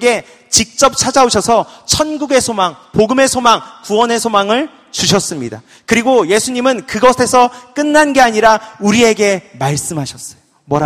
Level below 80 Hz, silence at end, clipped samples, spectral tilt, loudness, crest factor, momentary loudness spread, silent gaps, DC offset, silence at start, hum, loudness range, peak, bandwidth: -42 dBFS; 0 s; 0.2%; -3 dB/octave; -12 LUFS; 12 dB; 10 LU; none; under 0.1%; 0 s; none; 2 LU; 0 dBFS; 19.5 kHz